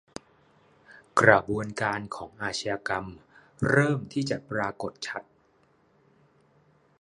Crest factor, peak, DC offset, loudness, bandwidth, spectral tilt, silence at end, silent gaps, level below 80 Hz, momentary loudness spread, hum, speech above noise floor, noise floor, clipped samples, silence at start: 28 dB; -2 dBFS; under 0.1%; -27 LUFS; 11.5 kHz; -5.5 dB/octave; 1.8 s; none; -58 dBFS; 18 LU; none; 38 dB; -65 dBFS; under 0.1%; 0.9 s